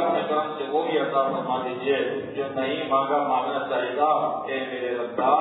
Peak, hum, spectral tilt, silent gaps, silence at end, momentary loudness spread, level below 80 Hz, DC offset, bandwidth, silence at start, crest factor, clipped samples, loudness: -8 dBFS; none; -8.5 dB/octave; none; 0 s; 6 LU; -72 dBFS; under 0.1%; 4.1 kHz; 0 s; 16 dB; under 0.1%; -25 LUFS